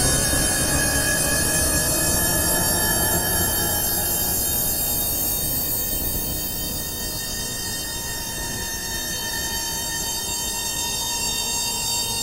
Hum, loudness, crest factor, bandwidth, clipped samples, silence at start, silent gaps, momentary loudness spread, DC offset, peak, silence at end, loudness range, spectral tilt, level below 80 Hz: none; -21 LUFS; 16 dB; 16 kHz; under 0.1%; 0 s; none; 7 LU; under 0.1%; -6 dBFS; 0 s; 6 LU; -2 dB/octave; -34 dBFS